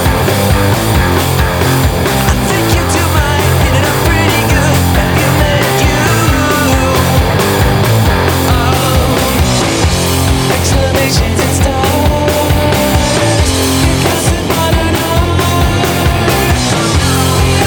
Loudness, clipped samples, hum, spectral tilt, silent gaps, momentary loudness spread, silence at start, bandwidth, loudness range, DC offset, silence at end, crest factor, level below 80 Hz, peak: -10 LUFS; under 0.1%; none; -4.5 dB/octave; none; 1 LU; 0 s; over 20 kHz; 1 LU; under 0.1%; 0 s; 10 dB; -20 dBFS; 0 dBFS